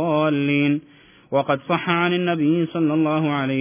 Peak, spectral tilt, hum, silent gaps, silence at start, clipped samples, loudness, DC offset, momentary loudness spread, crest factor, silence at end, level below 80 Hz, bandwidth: -6 dBFS; -10.5 dB/octave; none; none; 0 s; under 0.1%; -21 LUFS; under 0.1%; 3 LU; 14 dB; 0 s; -66 dBFS; 3.6 kHz